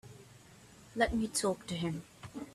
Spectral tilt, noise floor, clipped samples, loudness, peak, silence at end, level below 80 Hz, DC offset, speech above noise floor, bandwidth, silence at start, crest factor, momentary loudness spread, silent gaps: -4 dB/octave; -57 dBFS; under 0.1%; -35 LUFS; -16 dBFS; 0 s; -54 dBFS; under 0.1%; 24 dB; 15 kHz; 0.05 s; 22 dB; 19 LU; none